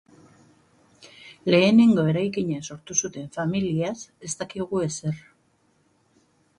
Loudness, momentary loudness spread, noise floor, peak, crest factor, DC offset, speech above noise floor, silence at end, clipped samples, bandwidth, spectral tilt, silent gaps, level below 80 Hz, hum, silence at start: -23 LUFS; 16 LU; -65 dBFS; -6 dBFS; 20 dB; under 0.1%; 42 dB; 1.4 s; under 0.1%; 11 kHz; -5 dB/octave; none; -62 dBFS; none; 1.25 s